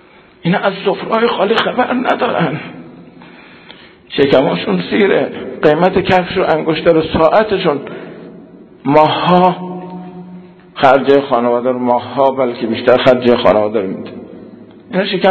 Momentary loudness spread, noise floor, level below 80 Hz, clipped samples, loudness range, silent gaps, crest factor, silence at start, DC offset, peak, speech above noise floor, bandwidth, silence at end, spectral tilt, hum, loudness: 18 LU; -39 dBFS; -46 dBFS; 0.3%; 4 LU; none; 14 dB; 0.45 s; under 0.1%; 0 dBFS; 27 dB; 8 kHz; 0 s; -7.5 dB/octave; none; -13 LUFS